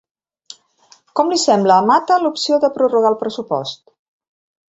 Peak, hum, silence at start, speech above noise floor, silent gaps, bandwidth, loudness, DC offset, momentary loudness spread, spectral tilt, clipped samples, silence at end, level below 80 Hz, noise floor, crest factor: -2 dBFS; none; 1.15 s; 37 dB; none; 8.2 kHz; -16 LUFS; under 0.1%; 11 LU; -4 dB/octave; under 0.1%; 0.95 s; -64 dBFS; -52 dBFS; 16 dB